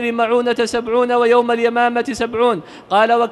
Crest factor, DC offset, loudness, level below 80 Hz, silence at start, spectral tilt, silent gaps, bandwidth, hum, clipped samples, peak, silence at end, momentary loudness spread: 14 dB; under 0.1%; -16 LUFS; -54 dBFS; 0 s; -4 dB/octave; none; 12 kHz; none; under 0.1%; -2 dBFS; 0 s; 5 LU